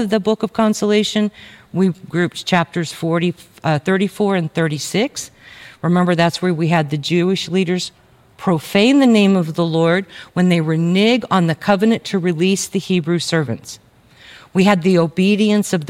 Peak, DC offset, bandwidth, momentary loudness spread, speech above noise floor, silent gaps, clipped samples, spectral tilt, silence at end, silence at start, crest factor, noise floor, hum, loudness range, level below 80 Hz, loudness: -2 dBFS; under 0.1%; 15.5 kHz; 9 LU; 29 dB; none; under 0.1%; -5.5 dB/octave; 0 s; 0 s; 16 dB; -45 dBFS; none; 4 LU; -58 dBFS; -17 LUFS